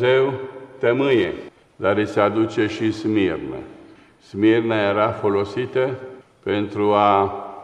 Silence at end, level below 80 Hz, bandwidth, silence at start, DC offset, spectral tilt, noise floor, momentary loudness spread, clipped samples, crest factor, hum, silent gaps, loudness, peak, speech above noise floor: 0 s; -58 dBFS; 9.2 kHz; 0 s; under 0.1%; -7 dB/octave; -46 dBFS; 15 LU; under 0.1%; 18 dB; none; none; -20 LUFS; -2 dBFS; 27 dB